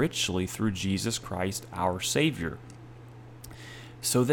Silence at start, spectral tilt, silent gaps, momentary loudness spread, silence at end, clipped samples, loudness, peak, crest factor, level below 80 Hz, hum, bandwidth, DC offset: 0 s; -4 dB/octave; none; 21 LU; 0 s; under 0.1%; -29 LUFS; -10 dBFS; 20 dB; -54 dBFS; none; 18 kHz; under 0.1%